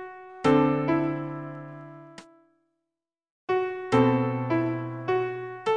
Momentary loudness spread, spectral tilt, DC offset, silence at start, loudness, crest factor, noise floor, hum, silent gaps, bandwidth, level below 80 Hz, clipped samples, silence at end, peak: 20 LU; -8 dB/octave; under 0.1%; 0 s; -26 LUFS; 20 dB; -88 dBFS; none; 3.30-3.48 s; 9.8 kHz; -60 dBFS; under 0.1%; 0 s; -8 dBFS